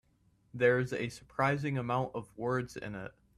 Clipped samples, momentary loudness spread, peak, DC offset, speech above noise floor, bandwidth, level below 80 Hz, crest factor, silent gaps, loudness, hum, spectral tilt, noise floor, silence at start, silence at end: under 0.1%; 13 LU; -14 dBFS; under 0.1%; 37 dB; 13 kHz; -64 dBFS; 20 dB; none; -33 LUFS; none; -6.5 dB/octave; -70 dBFS; 0.55 s; 0.25 s